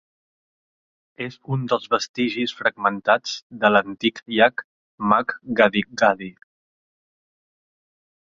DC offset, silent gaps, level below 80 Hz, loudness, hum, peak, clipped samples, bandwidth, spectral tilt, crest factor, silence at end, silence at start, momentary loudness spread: under 0.1%; 2.09-2.14 s, 3.42-3.50 s, 4.64-4.98 s; -64 dBFS; -21 LUFS; none; -2 dBFS; under 0.1%; 7.6 kHz; -5 dB/octave; 22 dB; 2 s; 1.2 s; 12 LU